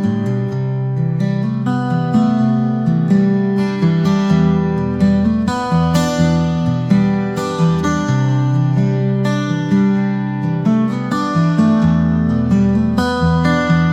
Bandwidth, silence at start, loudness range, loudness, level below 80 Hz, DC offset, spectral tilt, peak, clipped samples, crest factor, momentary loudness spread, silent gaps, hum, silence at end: 9.6 kHz; 0 s; 1 LU; -15 LUFS; -40 dBFS; 0.2%; -7.5 dB/octave; -2 dBFS; under 0.1%; 12 dB; 5 LU; none; none; 0 s